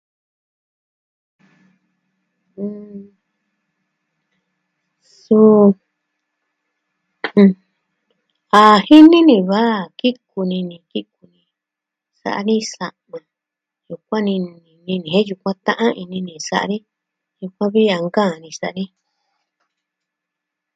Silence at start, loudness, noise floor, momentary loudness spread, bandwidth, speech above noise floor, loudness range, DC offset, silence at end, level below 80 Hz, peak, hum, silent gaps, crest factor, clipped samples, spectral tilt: 2.6 s; -15 LUFS; -84 dBFS; 21 LU; 9 kHz; 70 dB; 24 LU; under 0.1%; 1.9 s; -66 dBFS; 0 dBFS; none; none; 18 dB; 0.2%; -6 dB/octave